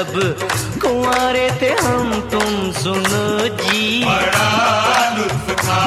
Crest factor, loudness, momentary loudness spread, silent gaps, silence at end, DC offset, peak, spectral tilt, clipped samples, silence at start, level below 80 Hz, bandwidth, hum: 14 dB; -16 LUFS; 5 LU; none; 0 s; under 0.1%; -2 dBFS; -4 dB/octave; under 0.1%; 0 s; -42 dBFS; 16 kHz; none